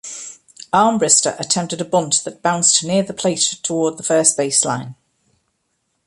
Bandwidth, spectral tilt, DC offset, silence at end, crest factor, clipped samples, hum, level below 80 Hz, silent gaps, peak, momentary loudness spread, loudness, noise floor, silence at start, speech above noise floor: 11.5 kHz; -2.5 dB/octave; under 0.1%; 1.15 s; 18 dB; under 0.1%; none; -62 dBFS; none; 0 dBFS; 10 LU; -16 LUFS; -70 dBFS; 0.05 s; 52 dB